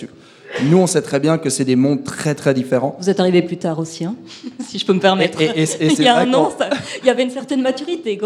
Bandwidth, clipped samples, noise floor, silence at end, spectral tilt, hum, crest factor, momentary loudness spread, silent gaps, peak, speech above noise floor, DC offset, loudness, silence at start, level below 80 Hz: 14 kHz; under 0.1%; -37 dBFS; 0 s; -5 dB/octave; none; 16 dB; 11 LU; none; 0 dBFS; 21 dB; under 0.1%; -17 LUFS; 0 s; -64 dBFS